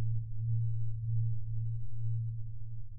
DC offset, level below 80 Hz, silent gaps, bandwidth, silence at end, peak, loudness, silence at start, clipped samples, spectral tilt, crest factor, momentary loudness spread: under 0.1%; -46 dBFS; none; 0.4 kHz; 0 s; -22 dBFS; -37 LUFS; 0 s; under 0.1%; -27 dB/octave; 8 dB; 7 LU